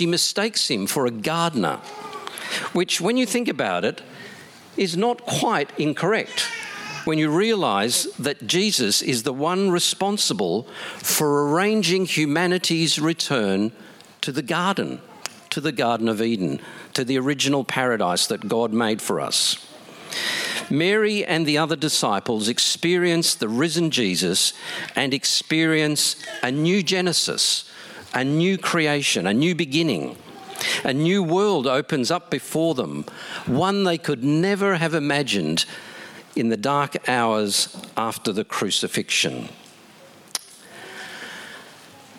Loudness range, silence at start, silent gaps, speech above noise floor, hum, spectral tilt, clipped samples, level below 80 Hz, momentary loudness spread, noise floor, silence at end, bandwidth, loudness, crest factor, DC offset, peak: 4 LU; 0 s; none; 26 dB; none; -3.5 dB/octave; under 0.1%; -68 dBFS; 12 LU; -48 dBFS; 0 s; 17 kHz; -21 LUFS; 20 dB; under 0.1%; -2 dBFS